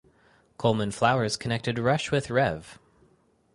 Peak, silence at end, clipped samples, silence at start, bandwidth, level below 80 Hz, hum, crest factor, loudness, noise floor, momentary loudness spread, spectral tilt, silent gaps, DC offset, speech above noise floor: -6 dBFS; 0.8 s; under 0.1%; 0.6 s; 11.5 kHz; -56 dBFS; none; 22 dB; -26 LUFS; -64 dBFS; 5 LU; -5.5 dB/octave; none; under 0.1%; 38 dB